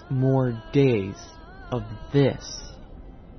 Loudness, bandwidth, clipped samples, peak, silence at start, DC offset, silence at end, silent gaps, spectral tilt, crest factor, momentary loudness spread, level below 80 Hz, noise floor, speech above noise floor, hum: -24 LUFS; 6.4 kHz; under 0.1%; -8 dBFS; 0 s; under 0.1%; 0 s; none; -7 dB/octave; 16 dB; 22 LU; -44 dBFS; -43 dBFS; 19 dB; none